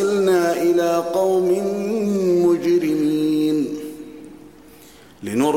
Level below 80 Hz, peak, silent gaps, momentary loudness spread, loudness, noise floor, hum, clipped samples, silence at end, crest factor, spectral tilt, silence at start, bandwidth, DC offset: -62 dBFS; -6 dBFS; none; 16 LU; -19 LUFS; -46 dBFS; none; under 0.1%; 0 s; 12 dB; -6 dB/octave; 0 s; 16.5 kHz; 0.2%